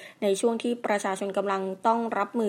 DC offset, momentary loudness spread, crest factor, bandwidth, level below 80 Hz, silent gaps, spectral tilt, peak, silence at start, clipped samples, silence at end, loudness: under 0.1%; 4 LU; 18 dB; 16 kHz; -84 dBFS; none; -4.5 dB/octave; -10 dBFS; 0 s; under 0.1%; 0 s; -27 LUFS